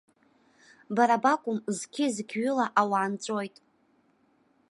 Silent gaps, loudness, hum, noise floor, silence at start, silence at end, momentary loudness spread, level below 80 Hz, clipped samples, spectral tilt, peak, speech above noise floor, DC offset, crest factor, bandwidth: none; -28 LUFS; none; -67 dBFS; 0.9 s; 1.2 s; 10 LU; -82 dBFS; under 0.1%; -4.5 dB/octave; -8 dBFS; 40 dB; under 0.1%; 20 dB; 11.5 kHz